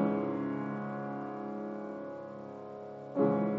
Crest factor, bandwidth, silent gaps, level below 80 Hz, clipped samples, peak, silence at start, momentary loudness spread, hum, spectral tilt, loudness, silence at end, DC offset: 18 dB; 5.8 kHz; none; -78 dBFS; under 0.1%; -16 dBFS; 0 s; 14 LU; none; -10 dB/octave; -37 LUFS; 0 s; under 0.1%